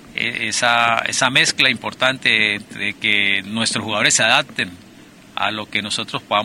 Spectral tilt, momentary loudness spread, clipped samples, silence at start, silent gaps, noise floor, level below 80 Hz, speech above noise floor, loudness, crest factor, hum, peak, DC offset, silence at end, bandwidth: -1.5 dB/octave; 9 LU; under 0.1%; 0 s; none; -44 dBFS; -58 dBFS; 25 dB; -17 LUFS; 18 dB; none; -2 dBFS; under 0.1%; 0 s; 16.5 kHz